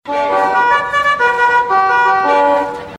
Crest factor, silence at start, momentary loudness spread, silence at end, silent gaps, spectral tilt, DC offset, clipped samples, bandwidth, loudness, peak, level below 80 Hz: 12 dB; 0.05 s; 3 LU; 0 s; none; -3.5 dB/octave; under 0.1%; under 0.1%; 12 kHz; -12 LUFS; -2 dBFS; -50 dBFS